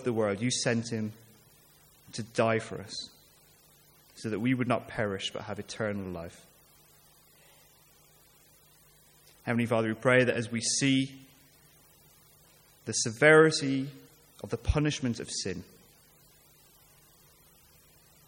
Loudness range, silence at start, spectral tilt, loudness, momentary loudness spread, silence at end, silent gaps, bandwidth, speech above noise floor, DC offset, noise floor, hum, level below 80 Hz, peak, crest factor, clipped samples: 13 LU; 0 s; -4.5 dB/octave; -29 LUFS; 17 LU; 2.65 s; none; 17 kHz; 32 dB; under 0.1%; -61 dBFS; none; -52 dBFS; -8 dBFS; 24 dB; under 0.1%